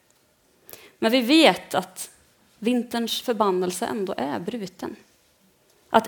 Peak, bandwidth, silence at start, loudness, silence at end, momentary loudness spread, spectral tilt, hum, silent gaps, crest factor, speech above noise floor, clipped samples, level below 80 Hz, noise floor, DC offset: 0 dBFS; 19 kHz; 1 s; -23 LUFS; 0 s; 20 LU; -4 dB/octave; none; none; 24 dB; 39 dB; under 0.1%; -68 dBFS; -62 dBFS; under 0.1%